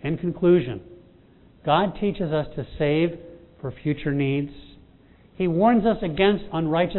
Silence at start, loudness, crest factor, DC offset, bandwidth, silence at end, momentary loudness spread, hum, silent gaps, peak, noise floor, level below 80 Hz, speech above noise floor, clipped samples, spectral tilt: 0 s; -23 LUFS; 18 dB; under 0.1%; 4.2 kHz; 0 s; 14 LU; none; none; -6 dBFS; -53 dBFS; -46 dBFS; 31 dB; under 0.1%; -11 dB/octave